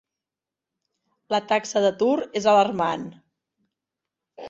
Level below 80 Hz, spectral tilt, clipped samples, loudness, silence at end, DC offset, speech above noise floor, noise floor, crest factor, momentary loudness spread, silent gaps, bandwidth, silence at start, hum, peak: -68 dBFS; -4.5 dB/octave; under 0.1%; -22 LUFS; 0 s; under 0.1%; 67 dB; -89 dBFS; 18 dB; 8 LU; none; 7.8 kHz; 1.3 s; none; -6 dBFS